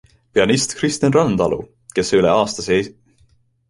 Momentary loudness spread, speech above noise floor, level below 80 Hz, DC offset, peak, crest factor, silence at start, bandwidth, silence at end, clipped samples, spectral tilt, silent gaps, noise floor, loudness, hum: 8 LU; 40 dB; -48 dBFS; under 0.1%; -2 dBFS; 16 dB; 0.35 s; 11.5 kHz; 0.8 s; under 0.1%; -4.5 dB/octave; none; -57 dBFS; -18 LUFS; none